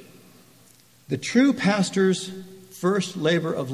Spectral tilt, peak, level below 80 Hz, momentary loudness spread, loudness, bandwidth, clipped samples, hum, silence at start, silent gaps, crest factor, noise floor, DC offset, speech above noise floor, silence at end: -5.5 dB/octave; -6 dBFS; -66 dBFS; 14 LU; -23 LUFS; 15 kHz; under 0.1%; none; 0 s; none; 18 dB; -55 dBFS; under 0.1%; 33 dB; 0 s